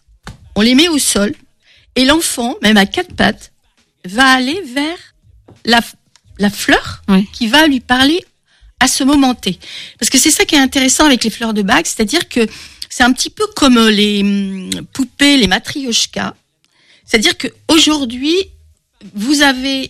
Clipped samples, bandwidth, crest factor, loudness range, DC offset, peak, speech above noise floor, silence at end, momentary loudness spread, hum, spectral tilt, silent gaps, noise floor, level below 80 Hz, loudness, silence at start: under 0.1%; 16 kHz; 14 dB; 3 LU; under 0.1%; 0 dBFS; 45 dB; 0 s; 13 LU; none; -2.5 dB/octave; none; -57 dBFS; -40 dBFS; -12 LUFS; 0.25 s